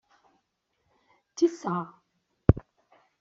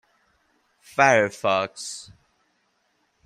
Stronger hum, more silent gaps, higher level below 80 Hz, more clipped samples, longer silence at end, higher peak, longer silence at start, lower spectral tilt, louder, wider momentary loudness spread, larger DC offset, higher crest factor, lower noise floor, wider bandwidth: neither; neither; first, -44 dBFS vs -70 dBFS; neither; second, 0.6 s vs 1.25 s; about the same, -2 dBFS vs -2 dBFS; first, 1.4 s vs 0.95 s; first, -8 dB/octave vs -3.5 dB/octave; second, -28 LUFS vs -22 LUFS; about the same, 16 LU vs 17 LU; neither; about the same, 28 dB vs 24 dB; first, -77 dBFS vs -69 dBFS; second, 7.6 kHz vs 14.5 kHz